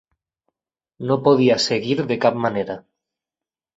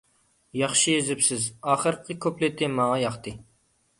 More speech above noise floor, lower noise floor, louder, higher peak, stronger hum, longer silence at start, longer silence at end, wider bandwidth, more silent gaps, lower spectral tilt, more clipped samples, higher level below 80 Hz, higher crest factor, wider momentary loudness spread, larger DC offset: first, over 71 dB vs 42 dB; first, under -90 dBFS vs -67 dBFS; first, -19 LUFS vs -24 LUFS; first, -2 dBFS vs -8 dBFS; neither; first, 1 s vs 0.55 s; first, 0.95 s vs 0.55 s; second, 8 kHz vs 11.5 kHz; neither; first, -5.5 dB/octave vs -3 dB/octave; neither; about the same, -62 dBFS vs -60 dBFS; about the same, 20 dB vs 18 dB; first, 14 LU vs 9 LU; neither